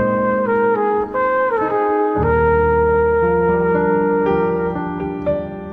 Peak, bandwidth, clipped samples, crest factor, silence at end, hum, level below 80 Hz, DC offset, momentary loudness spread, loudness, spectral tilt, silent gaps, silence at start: -4 dBFS; 4.3 kHz; under 0.1%; 12 dB; 0 s; none; -34 dBFS; under 0.1%; 7 LU; -17 LUFS; -10 dB/octave; none; 0 s